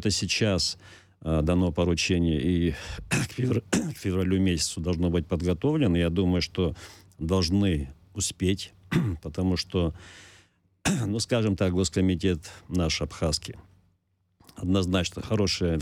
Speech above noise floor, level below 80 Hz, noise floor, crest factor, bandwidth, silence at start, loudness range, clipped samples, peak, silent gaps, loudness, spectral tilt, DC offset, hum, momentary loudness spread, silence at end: 45 dB; -42 dBFS; -71 dBFS; 16 dB; 15 kHz; 0 s; 3 LU; under 0.1%; -10 dBFS; none; -27 LUFS; -5 dB/octave; under 0.1%; none; 8 LU; 0 s